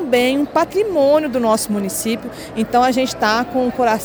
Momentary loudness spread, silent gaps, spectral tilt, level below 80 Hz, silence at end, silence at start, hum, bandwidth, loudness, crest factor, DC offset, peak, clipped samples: 7 LU; none; -4 dB/octave; -48 dBFS; 0 s; 0 s; none; over 20 kHz; -17 LUFS; 14 dB; under 0.1%; -2 dBFS; under 0.1%